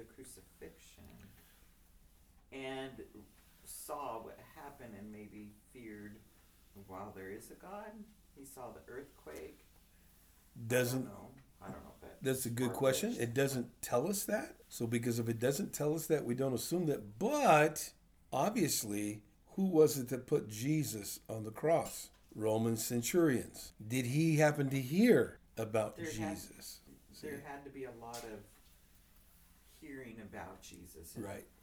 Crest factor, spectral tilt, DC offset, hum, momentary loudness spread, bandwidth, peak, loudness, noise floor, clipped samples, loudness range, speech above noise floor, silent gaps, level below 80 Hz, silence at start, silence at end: 22 dB; -5 dB/octave; under 0.1%; none; 22 LU; over 20 kHz; -16 dBFS; -35 LUFS; -65 dBFS; under 0.1%; 18 LU; 28 dB; none; -66 dBFS; 0 s; 0.2 s